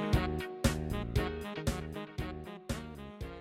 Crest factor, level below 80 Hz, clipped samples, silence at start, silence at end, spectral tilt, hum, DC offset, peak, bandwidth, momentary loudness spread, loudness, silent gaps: 22 dB; -42 dBFS; under 0.1%; 0 s; 0 s; -5.5 dB/octave; none; under 0.1%; -14 dBFS; 16.5 kHz; 12 LU; -37 LUFS; none